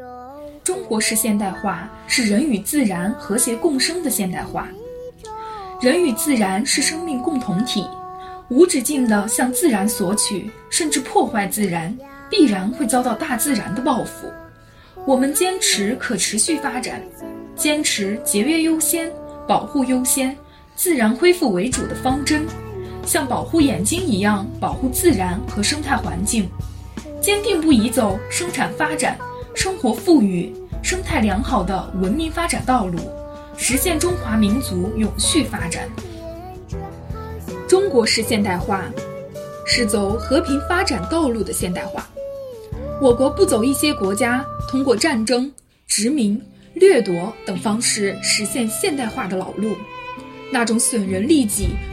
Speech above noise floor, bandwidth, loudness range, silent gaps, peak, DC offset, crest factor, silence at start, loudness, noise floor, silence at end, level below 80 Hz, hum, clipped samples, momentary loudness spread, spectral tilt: 26 dB; 16.5 kHz; 3 LU; none; -2 dBFS; under 0.1%; 18 dB; 0 s; -19 LUFS; -45 dBFS; 0 s; -38 dBFS; none; under 0.1%; 16 LU; -3.5 dB/octave